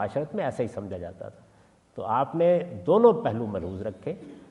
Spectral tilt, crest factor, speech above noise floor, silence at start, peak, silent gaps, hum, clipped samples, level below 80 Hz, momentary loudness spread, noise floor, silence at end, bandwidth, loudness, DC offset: -8.5 dB/octave; 22 dB; 33 dB; 0 s; -6 dBFS; none; none; under 0.1%; -64 dBFS; 20 LU; -59 dBFS; 0.1 s; 10 kHz; -26 LUFS; under 0.1%